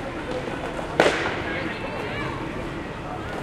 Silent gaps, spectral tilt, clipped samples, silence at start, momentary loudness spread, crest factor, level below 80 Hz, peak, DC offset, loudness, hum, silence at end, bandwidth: none; -5 dB/octave; under 0.1%; 0 s; 11 LU; 26 dB; -42 dBFS; -2 dBFS; under 0.1%; -27 LUFS; none; 0 s; 15.5 kHz